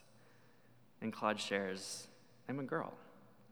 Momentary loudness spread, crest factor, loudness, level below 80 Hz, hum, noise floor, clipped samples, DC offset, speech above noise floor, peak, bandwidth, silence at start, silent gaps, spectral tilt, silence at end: 19 LU; 24 dB; -41 LUFS; under -90 dBFS; none; -68 dBFS; under 0.1%; under 0.1%; 27 dB; -20 dBFS; over 20 kHz; 0.15 s; none; -4 dB/octave; 0.1 s